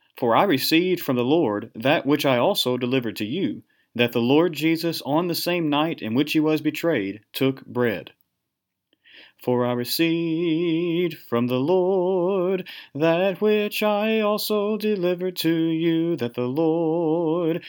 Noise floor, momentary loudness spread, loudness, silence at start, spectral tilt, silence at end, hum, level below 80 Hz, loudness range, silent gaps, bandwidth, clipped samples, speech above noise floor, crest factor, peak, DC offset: -81 dBFS; 6 LU; -22 LUFS; 0.15 s; -5.5 dB/octave; 0 s; none; -76 dBFS; 4 LU; none; 19.5 kHz; under 0.1%; 59 dB; 18 dB; -4 dBFS; under 0.1%